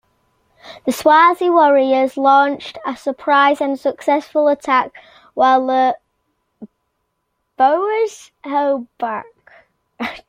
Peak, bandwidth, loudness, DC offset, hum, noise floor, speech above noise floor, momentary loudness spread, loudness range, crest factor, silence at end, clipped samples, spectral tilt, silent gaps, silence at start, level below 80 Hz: -2 dBFS; 16 kHz; -16 LUFS; under 0.1%; none; -71 dBFS; 56 dB; 14 LU; 7 LU; 16 dB; 0.1 s; under 0.1%; -3.5 dB/octave; none; 0.65 s; -64 dBFS